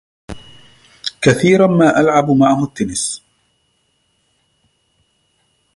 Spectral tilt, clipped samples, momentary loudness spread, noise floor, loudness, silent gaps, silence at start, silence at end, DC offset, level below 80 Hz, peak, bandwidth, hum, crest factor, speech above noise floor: -5.5 dB/octave; under 0.1%; 24 LU; -63 dBFS; -14 LUFS; none; 0.3 s; 2.6 s; under 0.1%; -48 dBFS; 0 dBFS; 11.5 kHz; none; 16 dB; 51 dB